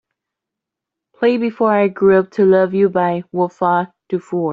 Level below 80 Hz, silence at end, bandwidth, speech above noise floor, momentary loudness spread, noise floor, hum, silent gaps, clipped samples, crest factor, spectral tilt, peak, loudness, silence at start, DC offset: -62 dBFS; 0 s; 5.2 kHz; 68 dB; 8 LU; -83 dBFS; none; none; under 0.1%; 14 dB; -8.5 dB/octave; -2 dBFS; -16 LUFS; 1.2 s; under 0.1%